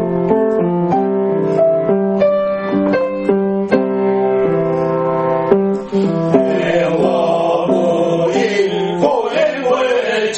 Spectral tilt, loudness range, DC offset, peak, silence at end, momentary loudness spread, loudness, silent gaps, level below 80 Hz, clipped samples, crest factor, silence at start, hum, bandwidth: -6.5 dB/octave; 1 LU; under 0.1%; 0 dBFS; 0 s; 2 LU; -15 LUFS; none; -52 dBFS; under 0.1%; 14 dB; 0 s; none; 8.6 kHz